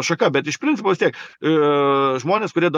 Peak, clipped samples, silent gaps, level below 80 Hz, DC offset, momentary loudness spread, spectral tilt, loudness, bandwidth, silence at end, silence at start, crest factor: -4 dBFS; under 0.1%; none; -72 dBFS; under 0.1%; 5 LU; -5 dB/octave; -19 LUFS; 10.5 kHz; 0 s; 0 s; 16 dB